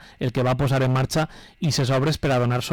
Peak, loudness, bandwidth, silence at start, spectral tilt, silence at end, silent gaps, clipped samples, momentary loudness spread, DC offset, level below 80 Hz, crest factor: -16 dBFS; -22 LUFS; 17.5 kHz; 0 s; -6 dB/octave; 0 s; none; under 0.1%; 6 LU; under 0.1%; -44 dBFS; 6 dB